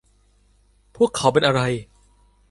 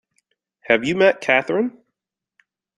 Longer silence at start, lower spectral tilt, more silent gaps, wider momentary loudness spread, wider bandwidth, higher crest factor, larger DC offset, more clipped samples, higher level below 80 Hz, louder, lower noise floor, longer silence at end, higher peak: first, 1 s vs 0.7 s; about the same, -5 dB/octave vs -5 dB/octave; neither; about the same, 8 LU vs 8 LU; about the same, 11.5 kHz vs 11 kHz; about the same, 20 dB vs 20 dB; neither; neither; first, -52 dBFS vs -64 dBFS; about the same, -20 LUFS vs -18 LUFS; second, -59 dBFS vs -82 dBFS; second, 0.65 s vs 1.1 s; about the same, -2 dBFS vs -2 dBFS